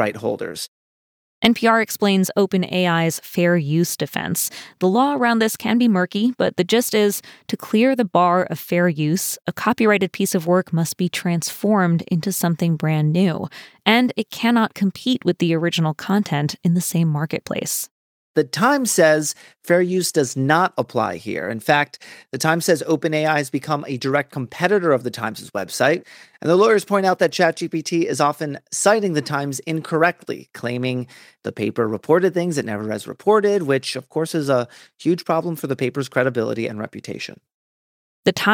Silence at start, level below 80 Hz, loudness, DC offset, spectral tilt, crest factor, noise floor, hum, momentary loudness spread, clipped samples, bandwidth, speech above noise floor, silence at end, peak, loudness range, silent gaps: 0 s; -66 dBFS; -20 LUFS; under 0.1%; -5 dB/octave; 18 dB; under -90 dBFS; none; 10 LU; under 0.1%; over 20 kHz; over 71 dB; 0 s; -2 dBFS; 3 LU; 0.68-1.42 s, 17.91-18.34 s, 37.54-38.23 s